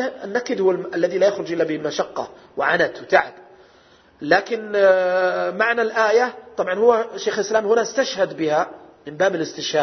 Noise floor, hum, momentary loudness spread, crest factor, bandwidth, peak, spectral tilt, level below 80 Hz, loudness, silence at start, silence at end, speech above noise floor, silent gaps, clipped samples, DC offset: -52 dBFS; none; 9 LU; 18 dB; 6.4 kHz; -2 dBFS; -4 dB/octave; -64 dBFS; -20 LUFS; 0 s; 0 s; 32 dB; none; under 0.1%; under 0.1%